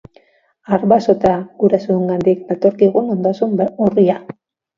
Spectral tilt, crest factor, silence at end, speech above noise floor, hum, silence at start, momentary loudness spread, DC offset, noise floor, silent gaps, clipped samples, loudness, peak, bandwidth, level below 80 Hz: -9 dB/octave; 16 dB; 0.45 s; 40 dB; none; 0.7 s; 5 LU; under 0.1%; -55 dBFS; none; under 0.1%; -15 LUFS; 0 dBFS; 7.2 kHz; -52 dBFS